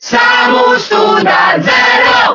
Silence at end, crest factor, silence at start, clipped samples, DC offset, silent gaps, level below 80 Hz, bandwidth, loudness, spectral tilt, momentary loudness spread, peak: 0 s; 8 dB; 0 s; 0.2%; under 0.1%; none; -50 dBFS; 6 kHz; -8 LUFS; -3.5 dB/octave; 3 LU; 0 dBFS